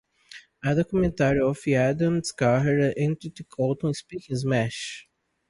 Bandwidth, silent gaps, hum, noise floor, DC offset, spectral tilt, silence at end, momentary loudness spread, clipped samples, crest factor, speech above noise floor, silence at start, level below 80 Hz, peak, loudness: 11.5 kHz; none; none; -49 dBFS; under 0.1%; -6.5 dB/octave; 0.5 s; 12 LU; under 0.1%; 16 dB; 25 dB; 0.3 s; -50 dBFS; -10 dBFS; -25 LUFS